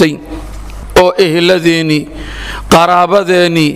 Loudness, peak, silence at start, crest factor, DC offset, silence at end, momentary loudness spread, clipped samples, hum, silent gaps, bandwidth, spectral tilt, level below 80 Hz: -9 LUFS; 0 dBFS; 0 s; 10 dB; under 0.1%; 0 s; 18 LU; 0.5%; none; none; 16 kHz; -5 dB/octave; -28 dBFS